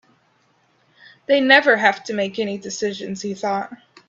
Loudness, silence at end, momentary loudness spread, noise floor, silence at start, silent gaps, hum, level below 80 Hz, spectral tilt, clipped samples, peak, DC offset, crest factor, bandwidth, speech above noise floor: -19 LUFS; 0.35 s; 15 LU; -61 dBFS; 1.3 s; none; none; -68 dBFS; -3.5 dB/octave; under 0.1%; 0 dBFS; under 0.1%; 22 dB; 7.8 kHz; 42 dB